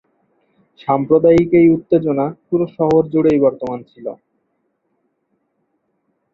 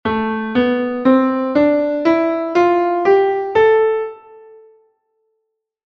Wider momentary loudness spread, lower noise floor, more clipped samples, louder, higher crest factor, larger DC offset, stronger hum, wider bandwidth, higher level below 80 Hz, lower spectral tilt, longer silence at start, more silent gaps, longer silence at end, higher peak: first, 17 LU vs 6 LU; second, -68 dBFS vs -73 dBFS; neither; about the same, -15 LUFS vs -15 LUFS; about the same, 16 dB vs 14 dB; neither; neither; about the same, 7 kHz vs 6.6 kHz; about the same, -50 dBFS vs -52 dBFS; first, -9.5 dB/octave vs -7 dB/octave; first, 0.85 s vs 0.05 s; neither; first, 2.2 s vs 1.75 s; about the same, -2 dBFS vs -2 dBFS